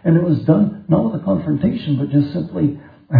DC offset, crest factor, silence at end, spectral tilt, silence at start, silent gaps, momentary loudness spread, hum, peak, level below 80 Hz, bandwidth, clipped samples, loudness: under 0.1%; 14 dB; 0 s; -12 dB/octave; 0.05 s; none; 6 LU; none; -2 dBFS; -50 dBFS; 5 kHz; under 0.1%; -18 LUFS